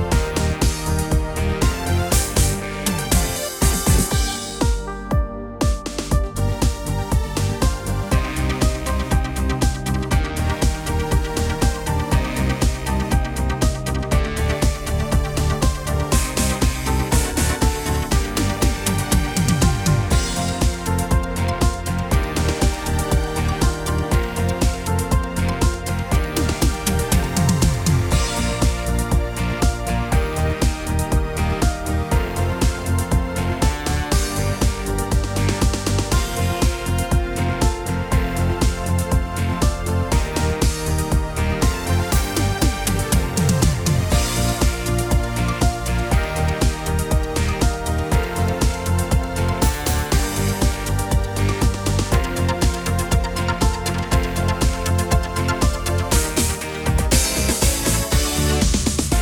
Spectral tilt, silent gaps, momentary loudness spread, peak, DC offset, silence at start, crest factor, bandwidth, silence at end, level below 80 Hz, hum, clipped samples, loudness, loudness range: -4.5 dB/octave; none; 4 LU; -2 dBFS; under 0.1%; 0 s; 16 dB; over 20 kHz; 0 s; -24 dBFS; none; under 0.1%; -21 LUFS; 2 LU